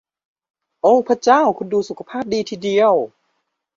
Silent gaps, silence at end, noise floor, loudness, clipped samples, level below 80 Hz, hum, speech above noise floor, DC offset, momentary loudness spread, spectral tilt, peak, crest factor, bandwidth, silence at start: none; 0.7 s; -71 dBFS; -17 LUFS; under 0.1%; -62 dBFS; none; 55 dB; under 0.1%; 11 LU; -5 dB/octave; -2 dBFS; 16 dB; 7.6 kHz; 0.85 s